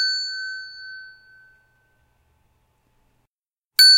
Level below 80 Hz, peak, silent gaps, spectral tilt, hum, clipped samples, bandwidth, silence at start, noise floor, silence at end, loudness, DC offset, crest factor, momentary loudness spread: -70 dBFS; -2 dBFS; 3.27-3.43 s, 3.53-3.71 s; 5 dB/octave; none; under 0.1%; 16 kHz; 0 s; -87 dBFS; 0 s; -20 LUFS; under 0.1%; 22 dB; 22 LU